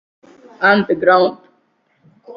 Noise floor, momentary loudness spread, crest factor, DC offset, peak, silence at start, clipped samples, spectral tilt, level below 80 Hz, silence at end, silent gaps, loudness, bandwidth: -61 dBFS; 4 LU; 18 dB; under 0.1%; 0 dBFS; 0.6 s; under 0.1%; -7.5 dB/octave; -60 dBFS; 0 s; none; -14 LUFS; 5.8 kHz